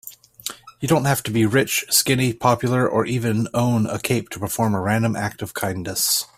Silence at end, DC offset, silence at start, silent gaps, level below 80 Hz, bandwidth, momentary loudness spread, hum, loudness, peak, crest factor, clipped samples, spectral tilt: 0.1 s; under 0.1%; 0.05 s; none; -54 dBFS; 16 kHz; 10 LU; none; -20 LUFS; -2 dBFS; 18 dB; under 0.1%; -4.5 dB/octave